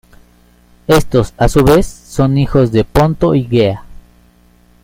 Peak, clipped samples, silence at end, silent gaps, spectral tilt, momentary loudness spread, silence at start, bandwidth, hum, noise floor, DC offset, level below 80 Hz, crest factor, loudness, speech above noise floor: 0 dBFS; under 0.1%; 0.9 s; none; -7 dB/octave; 6 LU; 0.9 s; 16.5 kHz; 60 Hz at -35 dBFS; -48 dBFS; under 0.1%; -26 dBFS; 14 dB; -12 LUFS; 37 dB